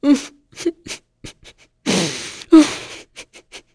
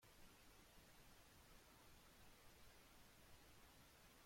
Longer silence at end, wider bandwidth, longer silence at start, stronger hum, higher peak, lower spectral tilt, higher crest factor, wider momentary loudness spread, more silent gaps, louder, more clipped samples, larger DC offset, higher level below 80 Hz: first, 0.15 s vs 0 s; second, 11 kHz vs 16.5 kHz; about the same, 0 s vs 0 s; neither; first, 0 dBFS vs -52 dBFS; about the same, -4 dB/octave vs -3 dB/octave; first, 20 dB vs 14 dB; first, 27 LU vs 0 LU; neither; first, -17 LUFS vs -68 LUFS; neither; neither; first, -54 dBFS vs -74 dBFS